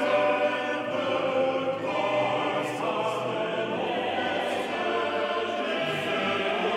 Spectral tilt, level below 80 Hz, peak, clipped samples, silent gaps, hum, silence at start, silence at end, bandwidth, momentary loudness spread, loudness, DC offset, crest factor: -4.5 dB/octave; -72 dBFS; -14 dBFS; under 0.1%; none; none; 0 s; 0 s; 14.5 kHz; 3 LU; -27 LUFS; under 0.1%; 14 dB